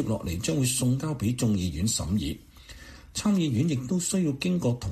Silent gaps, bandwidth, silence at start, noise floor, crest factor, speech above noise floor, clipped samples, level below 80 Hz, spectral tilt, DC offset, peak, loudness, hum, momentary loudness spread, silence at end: none; 15 kHz; 0 s; -47 dBFS; 12 dB; 20 dB; under 0.1%; -46 dBFS; -5 dB/octave; under 0.1%; -14 dBFS; -27 LUFS; none; 11 LU; 0 s